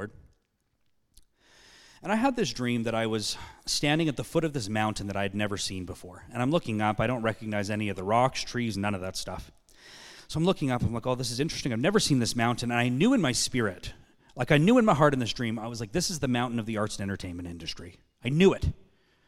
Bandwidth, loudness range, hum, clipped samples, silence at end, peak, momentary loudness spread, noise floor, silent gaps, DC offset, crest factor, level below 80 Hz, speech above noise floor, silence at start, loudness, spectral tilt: 16 kHz; 6 LU; none; under 0.1%; 0.45 s; -6 dBFS; 15 LU; -73 dBFS; none; under 0.1%; 22 dB; -50 dBFS; 46 dB; 0 s; -28 LUFS; -5 dB/octave